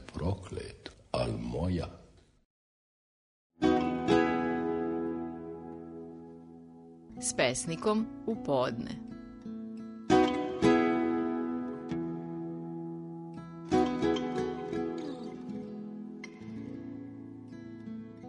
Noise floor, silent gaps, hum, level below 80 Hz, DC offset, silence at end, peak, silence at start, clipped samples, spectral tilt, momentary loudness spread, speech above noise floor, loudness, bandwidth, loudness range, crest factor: under -90 dBFS; 2.45-3.50 s; none; -56 dBFS; under 0.1%; 0 s; -12 dBFS; 0 s; under 0.1%; -5.5 dB/octave; 18 LU; over 57 dB; -32 LUFS; 10.5 kHz; 7 LU; 22 dB